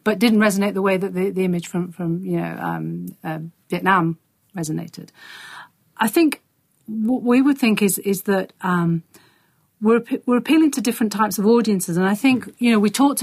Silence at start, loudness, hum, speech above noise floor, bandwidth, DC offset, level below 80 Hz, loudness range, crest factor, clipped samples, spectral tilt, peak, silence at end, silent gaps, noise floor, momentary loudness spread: 0.05 s; -20 LUFS; none; 42 dB; 15.5 kHz; under 0.1%; -64 dBFS; 6 LU; 18 dB; under 0.1%; -5.5 dB/octave; -2 dBFS; 0 s; none; -61 dBFS; 14 LU